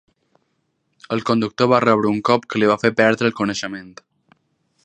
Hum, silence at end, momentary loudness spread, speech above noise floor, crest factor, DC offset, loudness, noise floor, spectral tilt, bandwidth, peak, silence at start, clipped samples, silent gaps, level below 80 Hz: none; 0.95 s; 11 LU; 52 dB; 20 dB; under 0.1%; -18 LUFS; -69 dBFS; -5.5 dB/octave; 9.4 kHz; 0 dBFS; 1.1 s; under 0.1%; none; -60 dBFS